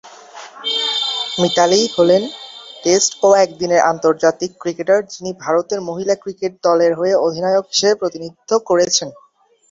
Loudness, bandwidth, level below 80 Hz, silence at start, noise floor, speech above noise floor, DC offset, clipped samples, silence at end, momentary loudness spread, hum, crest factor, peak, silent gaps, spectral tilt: -16 LUFS; 7.8 kHz; -60 dBFS; 0.05 s; -37 dBFS; 22 dB; under 0.1%; under 0.1%; 0.55 s; 12 LU; none; 16 dB; 0 dBFS; none; -3 dB/octave